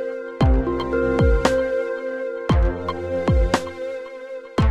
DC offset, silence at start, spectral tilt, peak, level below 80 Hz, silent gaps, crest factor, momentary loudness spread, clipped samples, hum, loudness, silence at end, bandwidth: under 0.1%; 0 s; -7 dB/octave; -2 dBFS; -26 dBFS; none; 18 dB; 12 LU; under 0.1%; none; -22 LUFS; 0 s; 11 kHz